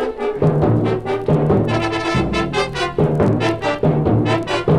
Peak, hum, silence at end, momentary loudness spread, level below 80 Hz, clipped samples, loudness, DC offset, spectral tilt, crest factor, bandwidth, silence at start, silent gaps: -2 dBFS; none; 0 s; 4 LU; -36 dBFS; under 0.1%; -18 LUFS; under 0.1%; -7 dB/octave; 14 dB; 10.5 kHz; 0 s; none